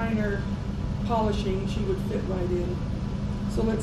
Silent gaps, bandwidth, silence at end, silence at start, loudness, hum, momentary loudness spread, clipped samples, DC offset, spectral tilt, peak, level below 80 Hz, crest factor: none; 12.5 kHz; 0 s; 0 s; -28 LUFS; none; 5 LU; under 0.1%; under 0.1%; -7.5 dB/octave; -14 dBFS; -34 dBFS; 14 dB